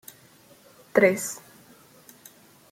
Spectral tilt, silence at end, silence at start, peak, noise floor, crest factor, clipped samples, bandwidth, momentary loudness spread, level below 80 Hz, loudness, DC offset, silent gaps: -4.5 dB/octave; 1.35 s; 0.95 s; -4 dBFS; -55 dBFS; 24 dB; under 0.1%; 16.5 kHz; 28 LU; -72 dBFS; -23 LUFS; under 0.1%; none